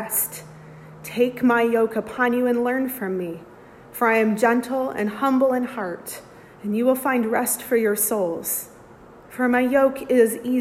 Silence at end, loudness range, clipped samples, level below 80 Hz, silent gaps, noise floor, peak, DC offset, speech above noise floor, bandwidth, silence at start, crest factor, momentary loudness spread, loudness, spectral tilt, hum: 0 s; 1 LU; under 0.1%; -62 dBFS; none; -46 dBFS; -6 dBFS; under 0.1%; 25 dB; 16 kHz; 0 s; 16 dB; 15 LU; -21 LUFS; -4.5 dB/octave; none